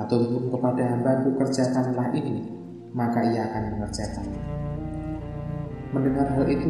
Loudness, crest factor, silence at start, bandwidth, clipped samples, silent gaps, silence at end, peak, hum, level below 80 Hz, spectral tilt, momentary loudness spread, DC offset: -26 LUFS; 16 dB; 0 s; 11.5 kHz; under 0.1%; none; 0 s; -10 dBFS; none; -44 dBFS; -7.5 dB/octave; 10 LU; under 0.1%